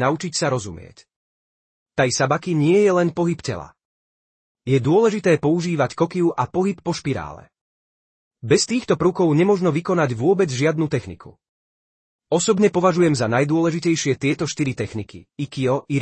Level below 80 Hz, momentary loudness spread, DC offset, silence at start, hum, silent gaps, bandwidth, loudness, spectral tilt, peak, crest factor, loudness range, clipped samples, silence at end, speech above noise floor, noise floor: -56 dBFS; 12 LU; under 0.1%; 0 s; none; 1.16-1.86 s, 3.85-4.55 s, 7.61-8.31 s, 11.49-12.19 s; 8.8 kHz; -20 LUFS; -5.5 dB/octave; -4 dBFS; 16 dB; 2 LU; under 0.1%; 0 s; over 71 dB; under -90 dBFS